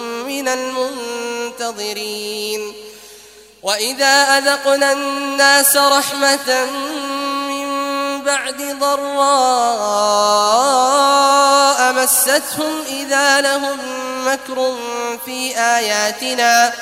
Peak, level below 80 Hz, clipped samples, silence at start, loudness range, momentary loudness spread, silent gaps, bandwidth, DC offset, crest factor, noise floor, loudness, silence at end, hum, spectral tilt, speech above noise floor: 0 dBFS; -62 dBFS; under 0.1%; 0 s; 6 LU; 12 LU; none; 16 kHz; under 0.1%; 16 dB; -42 dBFS; -15 LUFS; 0 s; none; 0 dB/octave; 27 dB